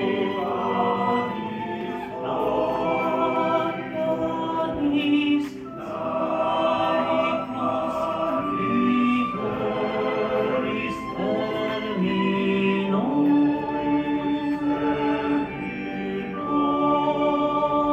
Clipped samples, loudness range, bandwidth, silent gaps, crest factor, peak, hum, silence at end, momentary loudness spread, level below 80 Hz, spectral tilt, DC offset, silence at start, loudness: under 0.1%; 2 LU; 8.4 kHz; none; 14 dB; -10 dBFS; none; 0 s; 8 LU; -54 dBFS; -7.5 dB/octave; under 0.1%; 0 s; -24 LUFS